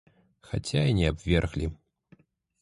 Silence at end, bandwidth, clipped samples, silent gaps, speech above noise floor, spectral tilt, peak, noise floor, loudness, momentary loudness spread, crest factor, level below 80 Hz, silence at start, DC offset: 0.85 s; 11.5 kHz; under 0.1%; none; 35 dB; -6.5 dB/octave; -8 dBFS; -61 dBFS; -28 LUFS; 11 LU; 20 dB; -38 dBFS; 0.5 s; under 0.1%